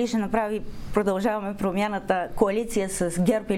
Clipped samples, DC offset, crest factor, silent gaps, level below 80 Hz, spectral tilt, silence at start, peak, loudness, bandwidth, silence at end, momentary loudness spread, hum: under 0.1%; under 0.1%; 20 dB; none; -44 dBFS; -5.5 dB/octave; 0 s; -6 dBFS; -26 LUFS; 16 kHz; 0 s; 4 LU; none